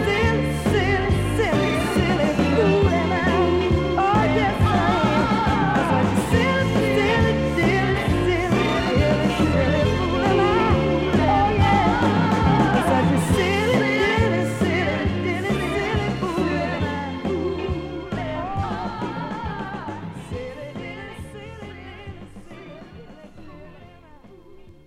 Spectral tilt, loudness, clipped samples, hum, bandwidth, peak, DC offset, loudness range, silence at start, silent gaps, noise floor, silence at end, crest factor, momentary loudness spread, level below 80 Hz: -6.5 dB/octave; -20 LUFS; under 0.1%; none; 16 kHz; -6 dBFS; under 0.1%; 15 LU; 0 s; none; -46 dBFS; 0.15 s; 16 dB; 15 LU; -34 dBFS